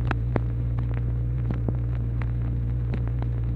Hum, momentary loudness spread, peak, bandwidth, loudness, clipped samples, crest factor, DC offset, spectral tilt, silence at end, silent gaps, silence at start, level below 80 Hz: none; 1 LU; -8 dBFS; 4.2 kHz; -27 LUFS; under 0.1%; 18 dB; under 0.1%; -10.5 dB/octave; 0 s; none; 0 s; -30 dBFS